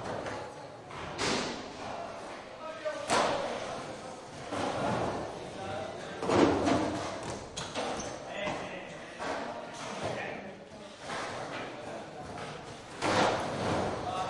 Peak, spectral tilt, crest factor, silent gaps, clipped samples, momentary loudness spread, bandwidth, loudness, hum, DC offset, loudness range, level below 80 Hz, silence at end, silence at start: -12 dBFS; -4 dB/octave; 22 dB; none; under 0.1%; 15 LU; 11.5 kHz; -34 LUFS; none; under 0.1%; 7 LU; -60 dBFS; 0 s; 0 s